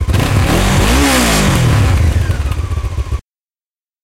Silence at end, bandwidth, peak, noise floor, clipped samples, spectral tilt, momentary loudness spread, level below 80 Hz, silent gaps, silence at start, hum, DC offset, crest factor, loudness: 0.85 s; 16.5 kHz; 0 dBFS; under -90 dBFS; under 0.1%; -5 dB/octave; 10 LU; -18 dBFS; none; 0 s; none; under 0.1%; 12 dB; -13 LUFS